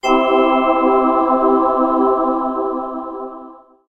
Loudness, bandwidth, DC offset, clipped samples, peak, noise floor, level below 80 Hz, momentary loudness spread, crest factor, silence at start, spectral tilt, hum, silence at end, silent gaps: -15 LUFS; 7.8 kHz; under 0.1%; under 0.1%; 0 dBFS; -39 dBFS; -48 dBFS; 14 LU; 16 dB; 0.05 s; -4.5 dB/octave; none; 0.35 s; none